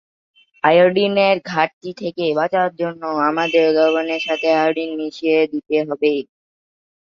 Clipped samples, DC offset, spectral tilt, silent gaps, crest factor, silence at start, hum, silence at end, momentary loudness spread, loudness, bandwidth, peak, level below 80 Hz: under 0.1%; under 0.1%; -6 dB/octave; 1.73-1.81 s; 16 dB; 0.65 s; none; 0.8 s; 9 LU; -18 LUFS; 7.2 kHz; -2 dBFS; -66 dBFS